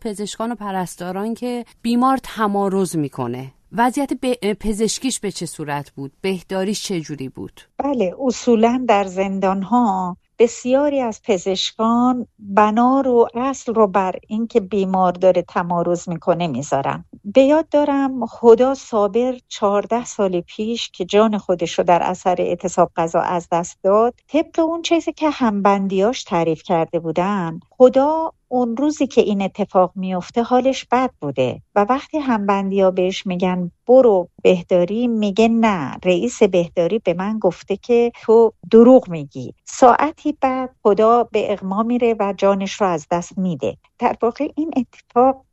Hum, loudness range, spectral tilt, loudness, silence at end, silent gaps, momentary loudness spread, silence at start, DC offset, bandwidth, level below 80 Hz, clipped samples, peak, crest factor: none; 6 LU; -5.5 dB/octave; -18 LUFS; 0.15 s; none; 11 LU; 0 s; under 0.1%; 13.5 kHz; -50 dBFS; under 0.1%; 0 dBFS; 18 dB